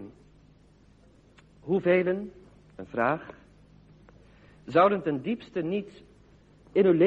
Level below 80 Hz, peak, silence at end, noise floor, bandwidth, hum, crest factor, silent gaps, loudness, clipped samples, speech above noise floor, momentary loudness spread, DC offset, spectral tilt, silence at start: -62 dBFS; -10 dBFS; 0 s; -58 dBFS; 7 kHz; none; 20 dB; none; -27 LUFS; under 0.1%; 33 dB; 24 LU; under 0.1%; -8.5 dB/octave; 0 s